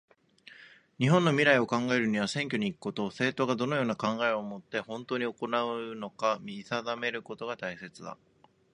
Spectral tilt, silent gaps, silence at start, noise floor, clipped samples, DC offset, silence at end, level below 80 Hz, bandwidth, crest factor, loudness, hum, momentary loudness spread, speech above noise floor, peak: -5.5 dB/octave; none; 0.5 s; -56 dBFS; under 0.1%; under 0.1%; 0.6 s; -72 dBFS; 10.5 kHz; 22 dB; -30 LUFS; none; 14 LU; 26 dB; -8 dBFS